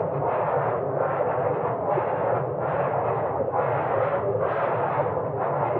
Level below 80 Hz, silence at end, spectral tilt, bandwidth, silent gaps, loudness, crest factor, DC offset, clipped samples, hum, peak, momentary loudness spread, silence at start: -60 dBFS; 0 s; -7 dB/octave; 4.2 kHz; none; -25 LUFS; 14 dB; under 0.1%; under 0.1%; none; -10 dBFS; 2 LU; 0 s